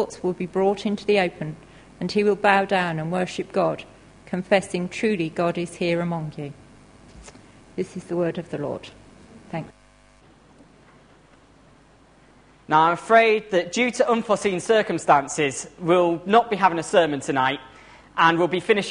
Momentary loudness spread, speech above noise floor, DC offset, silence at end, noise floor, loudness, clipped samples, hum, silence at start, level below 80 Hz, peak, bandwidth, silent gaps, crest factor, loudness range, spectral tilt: 15 LU; 32 dB; under 0.1%; 0 s; -54 dBFS; -22 LUFS; under 0.1%; none; 0 s; -58 dBFS; -2 dBFS; 10.5 kHz; none; 22 dB; 12 LU; -5 dB/octave